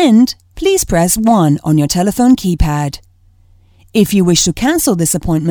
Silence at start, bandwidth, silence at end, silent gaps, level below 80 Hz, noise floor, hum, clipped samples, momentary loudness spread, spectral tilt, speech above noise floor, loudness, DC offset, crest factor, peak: 0 s; over 20 kHz; 0 s; none; -28 dBFS; -47 dBFS; none; under 0.1%; 6 LU; -5 dB/octave; 36 dB; -12 LUFS; under 0.1%; 12 dB; 0 dBFS